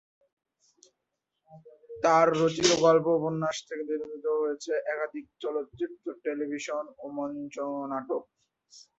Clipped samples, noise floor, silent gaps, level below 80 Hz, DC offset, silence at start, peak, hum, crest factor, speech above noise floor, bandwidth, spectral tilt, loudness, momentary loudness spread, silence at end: under 0.1%; -84 dBFS; none; -70 dBFS; under 0.1%; 1.5 s; -10 dBFS; none; 20 dB; 55 dB; 8.2 kHz; -4 dB/octave; -29 LUFS; 14 LU; 0.15 s